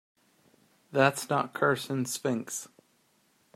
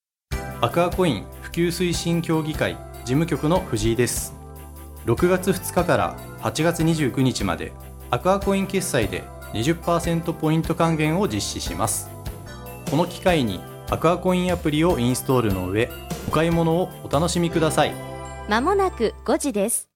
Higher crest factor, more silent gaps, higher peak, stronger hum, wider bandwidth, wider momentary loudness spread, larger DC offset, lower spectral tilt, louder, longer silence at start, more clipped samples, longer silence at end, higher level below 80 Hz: first, 24 dB vs 18 dB; neither; about the same, -6 dBFS vs -4 dBFS; neither; second, 16 kHz vs 18 kHz; about the same, 12 LU vs 12 LU; neither; about the same, -4.5 dB/octave vs -5 dB/octave; second, -29 LUFS vs -22 LUFS; first, 0.9 s vs 0.3 s; neither; first, 0.9 s vs 0.1 s; second, -76 dBFS vs -38 dBFS